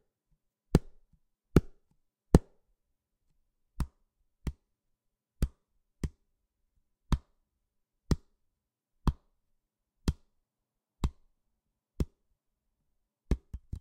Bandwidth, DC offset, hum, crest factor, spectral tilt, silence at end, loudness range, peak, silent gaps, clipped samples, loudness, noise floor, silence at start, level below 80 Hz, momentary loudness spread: 15.5 kHz; under 0.1%; none; 36 dB; -7.5 dB/octave; 0 s; 12 LU; -2 dBFS; none; under 0.1%; -34 LUFS; -87 dBFS; 0.75 s; -40 dBFS; 16 LU